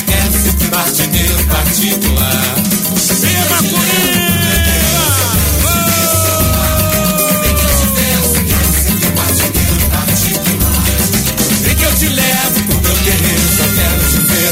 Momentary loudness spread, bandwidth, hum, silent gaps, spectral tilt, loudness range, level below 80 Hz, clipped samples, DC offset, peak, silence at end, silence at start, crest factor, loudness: 2 LU; 16.5 kHz; none; none; -3.5 dB/octave; 1 LU; -20 dBFS; under 0.1%; under 0.1%; 0 dBFS; 0 s; 0 s; 12 dB; -10 LUFS